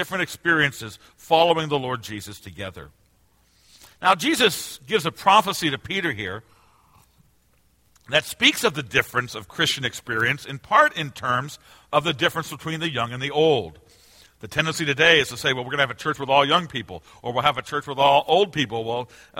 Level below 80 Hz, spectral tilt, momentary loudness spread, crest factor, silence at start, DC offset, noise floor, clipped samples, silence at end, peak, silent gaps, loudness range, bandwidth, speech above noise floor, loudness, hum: -58 dBFS; -3.5 dB/octave; 14 LU; 22 dB; 0 s; under 0.1%; -61 dBFS; under 0.1%; 0 s; -2 dBFS; none; 4 LU; 16.5 kHz; 39 dB; -21 LUFS; none